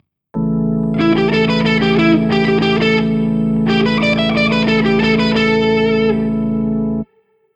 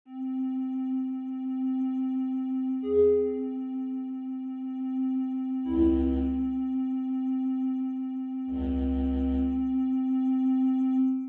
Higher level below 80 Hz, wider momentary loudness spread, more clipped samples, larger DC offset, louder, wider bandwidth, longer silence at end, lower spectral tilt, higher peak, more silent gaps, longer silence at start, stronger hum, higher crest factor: about the same, -38 dBFS vs -42 dBFS; second, 5 LU vs 9 LU; neither; neither; first, -14 LUFS vs -29 LUFS; first, 8.2 kHz vs 3.5 kHz; first, 0.5 s vs 0 s; second, -7 dB/octave vs -11 dB/octave; first, -2 dBFS vs -14 dBFS; neither; first, 0.35 s vs 0.05 s; neither; about the same, 12 dB vs 14 dB